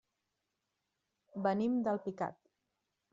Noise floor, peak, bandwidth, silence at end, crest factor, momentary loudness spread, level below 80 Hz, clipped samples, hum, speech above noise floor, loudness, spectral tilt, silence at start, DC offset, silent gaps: -86 dBFS; -18 dBFS; 7.6 kHz; 0.8 s; 20 dB; 9 LU; -82 dBFS; under 0.1%; none; 52 dB; -36 LUFS; -7 dB/octave; 1.35 s; under 0.1%; none